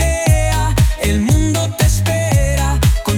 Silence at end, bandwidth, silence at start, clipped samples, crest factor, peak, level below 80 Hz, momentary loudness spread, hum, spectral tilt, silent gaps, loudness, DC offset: 0 s; 18 kHz; 0 s; under 0.1%; 12 dB; -2 dBFS; -18 dBFS; 2 LU; none; -5 dB/octave; none; -15 LUFS; under 0.1%